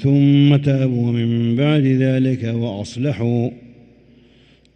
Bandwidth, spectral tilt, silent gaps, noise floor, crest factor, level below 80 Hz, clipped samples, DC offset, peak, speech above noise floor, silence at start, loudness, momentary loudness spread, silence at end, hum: 8.6 kHz; -8.5 dB/octave; none; -51 dBFS; 14 dB; -54 dBFS; under 0.1%; under 0.1%; -4 dBFS; 35 dB; 0 s; -17 LUFS; 10 LU; 1.1 s; none